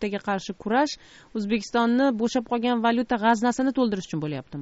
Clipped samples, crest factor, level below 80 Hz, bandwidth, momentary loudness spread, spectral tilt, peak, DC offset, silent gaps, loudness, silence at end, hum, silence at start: under 0.1%; 16 dB; -58 dBFS; 8 kHz; 9 LU; -4 dB/octave; -8 dBFS; under 0.1%; none; -24 LUFS; 0 s; none; 0 s